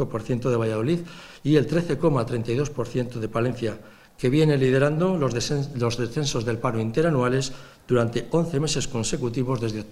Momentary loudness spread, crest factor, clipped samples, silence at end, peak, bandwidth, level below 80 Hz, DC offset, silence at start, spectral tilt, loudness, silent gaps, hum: 7 LU; 18 dB; under 0.1%; 0 s; -6 dBFS; 13.5 kHz; -46 dBFS; under 0.1%; 0 s; -6 dB/octave; -24 LUFS; none; none